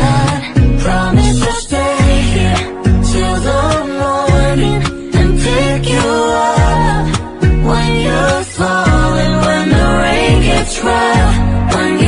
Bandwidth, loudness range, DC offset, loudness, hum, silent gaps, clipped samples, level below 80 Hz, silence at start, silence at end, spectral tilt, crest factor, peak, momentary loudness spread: 11 kHz; 1 LU; under 0.1%; -12 LUFS; none; none; under 0.1%; -18 dBFS; 0 s; 0 s; -5.5 dB/octave; 10 dB; -2 dBFS; 4 LU